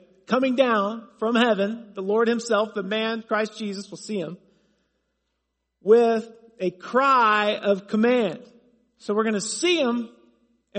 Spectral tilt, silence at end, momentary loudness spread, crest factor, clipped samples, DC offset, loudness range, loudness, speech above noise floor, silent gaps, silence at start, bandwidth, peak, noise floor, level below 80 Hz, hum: -4 dB/octave; 0 s; 14 LU; 20 dB; under 0.1%; under 0.1%; 5 LU; -23 LUFS; 55 dB; none; 0.3 s; 8.8 kHz; -4 dBFS; -78 dBFS; -74 dBFS; none